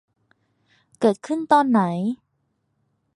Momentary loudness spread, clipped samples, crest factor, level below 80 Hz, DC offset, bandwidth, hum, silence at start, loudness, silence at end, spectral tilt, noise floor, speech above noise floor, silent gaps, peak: 11 LU; under 0.1%; 20 dB; -72 dBFS; under 0.1%; 11.5 kHz; none; 1 s; -21 LUFS; 1 s; -7 dB/octave; -72 dBFS; 52 dB; none; -4 dBFS